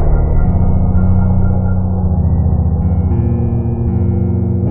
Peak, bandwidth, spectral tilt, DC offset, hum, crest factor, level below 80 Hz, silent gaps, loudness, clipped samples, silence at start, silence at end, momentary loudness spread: -2 dBFS; 2.4 kHz; -14.5 dB/octave; under 0.1%; none; 10 dB; -16 dBFS; none; -14 LUFS; under 0.1%; 0 s; 0 s; 3 LU